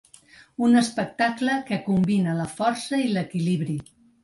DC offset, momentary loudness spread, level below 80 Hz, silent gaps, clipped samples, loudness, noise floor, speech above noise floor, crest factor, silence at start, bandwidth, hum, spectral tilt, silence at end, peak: under 0.1%; 7 LU; -62 dBFS; none; under 0.1%; -24 LUFS; -52 dBFS; 29 dB; 16 dB; 0.6 s; 11.5 kHz; none; -6 dB/octave; 0.4 s; -8 dBFS